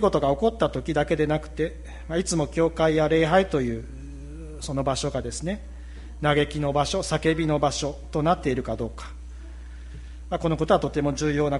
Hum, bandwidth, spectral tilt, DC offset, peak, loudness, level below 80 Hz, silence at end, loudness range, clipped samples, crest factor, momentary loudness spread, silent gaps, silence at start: none; 11.5 kHz; -5.5 dB/octave; under 0.1%; -6 dBFS; -25 LUFS; -38 dBFS; 0 s; 4 LU; under 0.1%; 18 dB; 20 LU; none; 0 s